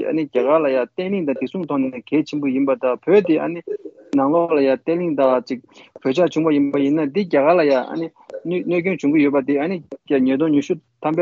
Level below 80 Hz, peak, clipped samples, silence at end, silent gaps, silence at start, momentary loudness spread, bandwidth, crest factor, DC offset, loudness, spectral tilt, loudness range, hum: -68 dBFS; -4 dBFS; under 0.1%; 0 s; none; 0 s; 10 LU; 7.4 kHz; 16 dB; under 0.1%; -19 LUFS; -7.5 dB/octave; 2 LU; none